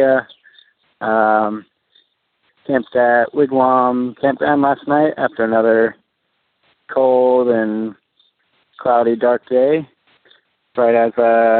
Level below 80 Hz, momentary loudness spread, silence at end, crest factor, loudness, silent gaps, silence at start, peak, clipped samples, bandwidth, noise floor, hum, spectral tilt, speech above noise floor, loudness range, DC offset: -66 dBFS; 9 LU; 0 s; 16 dB; -16 LUFS; none; 0 s; -2 dBFS; under 0.1%; 4.4 kHz; -68 dBFS; none; -10.5 dB/octave; 54 dB; 3 LU; under 0.1%